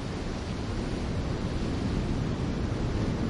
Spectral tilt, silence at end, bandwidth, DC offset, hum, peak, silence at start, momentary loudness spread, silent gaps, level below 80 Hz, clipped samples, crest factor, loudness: -7 dB/octave; 0 s; 11 kHz; under 0.1%; none; -16 dBFS; 0 s; 4 LU; none; -36 dBFS; under 0.1%; 14 dB; -32 LUFS